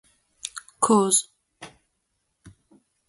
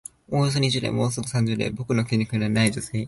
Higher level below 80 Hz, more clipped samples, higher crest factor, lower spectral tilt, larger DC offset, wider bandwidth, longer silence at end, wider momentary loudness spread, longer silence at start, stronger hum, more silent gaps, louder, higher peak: second, -68 dBFS vs -52 dBFS; neither; first, 22 dB vs 16 dB; second, -3.5 dB/octave vs -5.5 dB/octave; neither; about the same, 12 kHz vs 11.5 kHz; first, 0.6 s vs 0 s; first, 27 LU vs 4 LU; first, 0.45 s vs 0.3 s; neither; neither; first, -20 LUFS vs -24 LUFS; first, -4 dBFS vs -8 dBFS